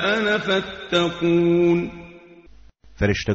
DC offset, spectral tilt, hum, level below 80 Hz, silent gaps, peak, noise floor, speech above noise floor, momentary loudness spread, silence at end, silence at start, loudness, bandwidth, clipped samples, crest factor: under 0.1%; -4 dB/octave; none; -44 dBFS; none; -6 dBFS; -49 dBFS; 29 dB; 7 LU; 0 s; 0 s; -20 LUFS; 7.8 kHz; under 0.1%; 16 dB